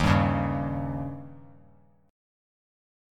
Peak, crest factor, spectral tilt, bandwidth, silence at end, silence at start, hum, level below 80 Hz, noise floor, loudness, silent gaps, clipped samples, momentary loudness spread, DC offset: -6 dBFS; 22 dB; -7.5 dB/octave; 12 kHz; 1.7 s; 0 s; none; -42 dBFS; -59 dBFS; -28 LUFS; none; under 0.1%; 19 LU; under 0.1%